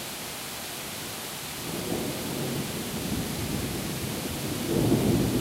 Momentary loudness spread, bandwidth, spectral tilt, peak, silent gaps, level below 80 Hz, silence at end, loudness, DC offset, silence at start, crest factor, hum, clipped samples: 9 LU; 16 kHz; -4.5 dB/octave; -12 dBFS; none; -46 dBFS; 0 s; -30 LUFS; under 0.1%; 0 s; 18 dB; none; under 0.1%